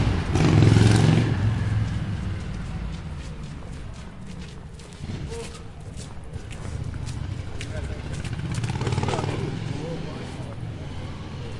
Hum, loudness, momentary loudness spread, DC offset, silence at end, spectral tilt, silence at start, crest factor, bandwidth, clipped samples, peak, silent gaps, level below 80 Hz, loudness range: none; -26 LUFS; 20 LU; under 0.1%; 0 s; -6.5 dB/octave; 0 s; 20 dB; 11.5 kHz; under 0.1%; -4 dBFS; none; -38 dBFS; 15 LU